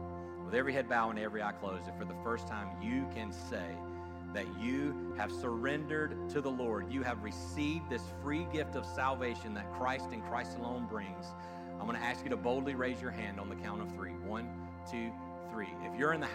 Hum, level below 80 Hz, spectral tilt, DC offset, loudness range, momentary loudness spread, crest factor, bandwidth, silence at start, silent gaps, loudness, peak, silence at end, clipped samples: none; -60 dBFS; -6 dB/octave; under 0.1%; 3 LU; 8 LU; 18 dB; 15.5 kHz; 0 s; none; -38 LUFS; -20 dBFS; 0 s; under 0.1%